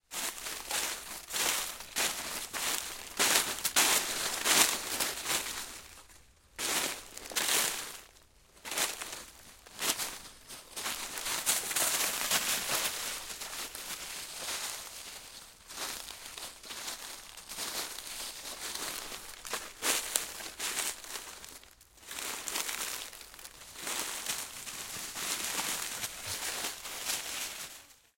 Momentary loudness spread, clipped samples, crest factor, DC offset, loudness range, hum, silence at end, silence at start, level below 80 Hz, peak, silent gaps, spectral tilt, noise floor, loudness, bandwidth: 17 LU; under 0.1%; 30 dB; under 0.1%; 11 LU; none; 0.2 s; 0.1 s; -64 dBFS; -6 dBFS; none; 0.5 dB/octave; -60 dBFS; -33 LUFS; 17 kHz